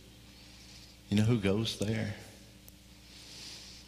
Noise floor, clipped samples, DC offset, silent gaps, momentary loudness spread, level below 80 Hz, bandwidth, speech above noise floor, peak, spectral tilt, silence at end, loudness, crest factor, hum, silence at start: -55 dBFS; under 0.1%; under 0.1%; none; 25 LU; -58 dBFS; 15.5 kHz; 25 dB; -14 dBFS; -6 dB/octave; 0.05 s; -33 LUFS; 22 dB; none; 0.05 s